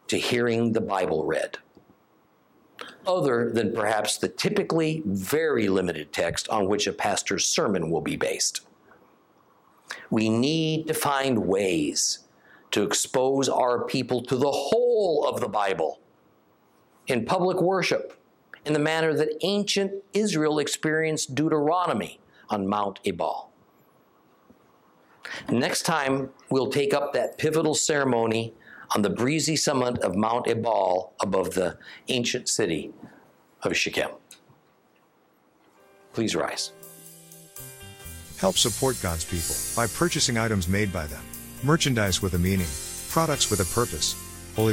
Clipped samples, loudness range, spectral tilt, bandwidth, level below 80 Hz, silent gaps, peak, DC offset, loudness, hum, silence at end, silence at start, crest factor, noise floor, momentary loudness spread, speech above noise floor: under 0.1%; 6 LU; -4 dB/octave; 16.5 kHz; -54 dBFS; none; -8 dBFS; under 0.1%; -25 LUFS; none; 0 s; 0.1 s; 18 dB; -63 dBFS; 11 LU; 38 dB